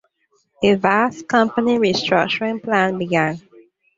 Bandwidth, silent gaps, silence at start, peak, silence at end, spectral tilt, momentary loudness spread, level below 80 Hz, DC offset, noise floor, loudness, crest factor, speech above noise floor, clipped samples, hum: 7.8 kHz; none; 0.6 s; -2 dBFS; 0.6 s; -5.5 dB/octave; 4 LU; -58 dBFS; under 0.1%; -65 dBFS; -18 LUFS; 18 dB; 47 dB; under 0.1%; none